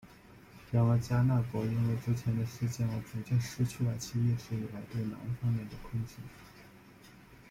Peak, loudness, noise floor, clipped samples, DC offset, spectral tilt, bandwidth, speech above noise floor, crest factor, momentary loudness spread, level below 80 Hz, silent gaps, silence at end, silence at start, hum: -18 dBFS; -33 LUFS; -56 dBFS; under 0.1%; under 0.1%; -7 dB/octave; 15.5 kHz; 24 dB; 16 dB; 12 LU; -58 dBFS; none; 0.15 s; 0.05 s; none